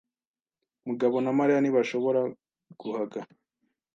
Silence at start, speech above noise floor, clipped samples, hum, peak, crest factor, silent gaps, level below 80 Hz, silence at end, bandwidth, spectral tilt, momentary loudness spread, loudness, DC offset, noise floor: 0.85 s; over 64 dB; under 0.1%; none; -12 dBFS; 16 dB; none; -82 dBFS; 0.7 s; 7.4 kHz; -7 dB/octave; 15 LU; -27 LUFS; under 0.1%; under -90 dBFS